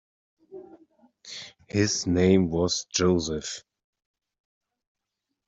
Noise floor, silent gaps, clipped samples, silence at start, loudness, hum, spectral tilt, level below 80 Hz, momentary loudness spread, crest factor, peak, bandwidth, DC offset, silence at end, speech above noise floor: -84 dBFS; none; under 0.1%; 0.5 s; -24 LUFS; none; -4.5 dB/octave; -56 dBFS; 19 LU; 20 dB; -8 dBFS; 8 kHz; under 0.1%; 1.9 s; 59 dB